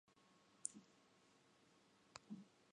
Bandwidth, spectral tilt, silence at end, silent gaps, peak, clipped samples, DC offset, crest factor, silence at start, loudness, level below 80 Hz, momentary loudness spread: 11 kHz; -2.5 dB/octave; 0 s; none; -24 dBFS; under 0.1%; under 0.1%; 38 dB; 0.05 s; -55 LUFS; under -90 dBFS; 11 LU